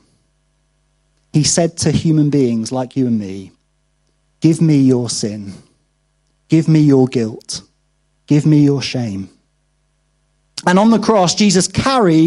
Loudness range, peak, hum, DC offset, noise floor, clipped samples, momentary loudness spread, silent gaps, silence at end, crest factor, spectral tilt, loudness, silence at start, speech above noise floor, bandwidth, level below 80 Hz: 3 LU; 0 dBFS; none; under 0.1%; -62 dBFS; under 0.1%; 15 LU; none; 0 s; 16 dB; -5.5 dB/octave; -14 LUFS; 1.35 s; 49 dB; 11.5 kHz; -48 dBFS